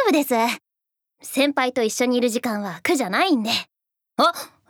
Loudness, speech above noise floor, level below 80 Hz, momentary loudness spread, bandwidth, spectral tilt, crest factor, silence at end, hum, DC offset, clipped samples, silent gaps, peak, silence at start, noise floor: -21 LUFS; 63 dB; -74 dBFS; 10 LU; over 20 kHz; -3 dB/octave; 18 dB; 0.25 s; none; under 0.1%; under 0.1%; none; -4 dBFS; 0 s; -84 dBFS